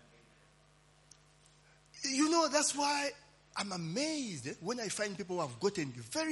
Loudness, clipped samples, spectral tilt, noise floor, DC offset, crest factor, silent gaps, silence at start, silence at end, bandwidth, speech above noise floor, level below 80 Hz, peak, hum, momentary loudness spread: -35 LUFS; under 0.1%; -3 dB/octave; -66 dBFS; under 0.1%; 20 dB; none; 1.95 s; 0 s; 11.5 kHz; 29 dB; -74 dBFS; -16 dBFS; none; 11 LU